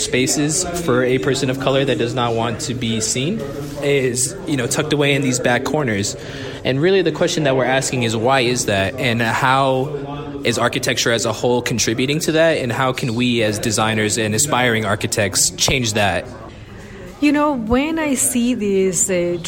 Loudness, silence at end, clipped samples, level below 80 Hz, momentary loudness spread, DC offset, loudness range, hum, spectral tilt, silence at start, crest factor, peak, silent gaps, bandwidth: -17 LUFS; 0 s; under 0.1%; -42 dBFS; 7 LU; under 0.1%; 2 LU; none; -3.5 dB/octave; 0 s; 14 dB; -4 dBFS; none; 16.5 kHz